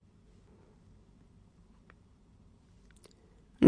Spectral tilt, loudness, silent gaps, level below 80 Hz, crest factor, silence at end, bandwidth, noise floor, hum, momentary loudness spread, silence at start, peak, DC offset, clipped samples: -8 dB/octave; -62 LUFS; none; -62 dBFS; 28 dB; 0 s; 10 kHz; -61 dBFS; none; 3 LU; 3.6 s; -6 dBFS; under 0.1%; under 0.1%